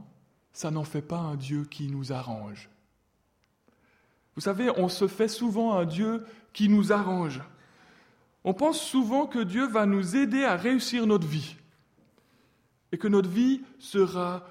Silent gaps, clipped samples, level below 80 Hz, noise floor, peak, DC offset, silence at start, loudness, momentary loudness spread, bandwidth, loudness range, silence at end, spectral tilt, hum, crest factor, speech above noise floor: none; under 0.1%; -68 dBFS; -71 dBFS; -10 dBFS; under 0.1%; 0 s; -27 LUFS; 12 LU; 15.5 kHz; 9 LU; 0 s; -6 dB/octave; none; 18 dB; 44 dB